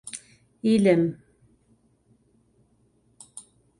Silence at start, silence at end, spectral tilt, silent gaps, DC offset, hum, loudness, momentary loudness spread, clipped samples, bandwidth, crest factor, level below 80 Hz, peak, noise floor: 0.05 s; 0.4 s; -6.5 dB/octave; none; under 0.1%; none; -22 LUFS; 25 LU; under 0.1%; 11.5 kHz; 22 dB; -64 dBFS; -8 dBFS; -65 dBFS